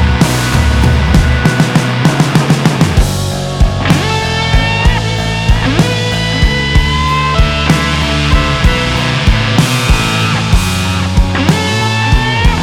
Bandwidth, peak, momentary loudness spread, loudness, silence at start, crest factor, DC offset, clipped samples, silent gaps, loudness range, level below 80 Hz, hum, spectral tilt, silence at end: 17 kHz; 0 dBFS; 3 LU; -11 LUFS; 0 s; 10 dB; under 0.1%; under 0.1%; none; 1 LU; -16 dBFS; none; -5 dB/octave; 0 s